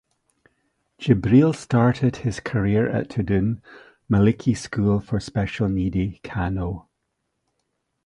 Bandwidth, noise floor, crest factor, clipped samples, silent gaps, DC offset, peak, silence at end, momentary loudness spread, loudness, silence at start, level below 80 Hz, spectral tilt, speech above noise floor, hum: 11 kHz; -76 dBFS; 20 dB; under 0.1%; none; under 0.1%; -2 dBFS; 1.25 s; 11 LU; -22 LUFS; 1 s; -42 dBFS; -7.5 dB/octave; 55 dB; none